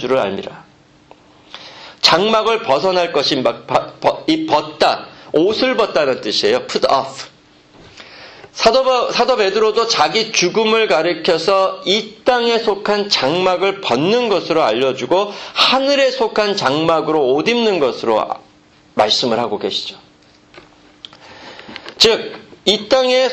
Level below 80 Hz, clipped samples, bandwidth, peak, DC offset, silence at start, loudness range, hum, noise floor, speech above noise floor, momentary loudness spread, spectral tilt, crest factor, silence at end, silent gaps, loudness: -54 dBFS; under 0.1%; 14 kHz; 0 dBFS; under 0.1%; 0 s; 5 LU; none; -49 dBFS; 34 dB; 15 LU; -3.5 dB/octave; 16 dB; 0 s; none; -15 LUFS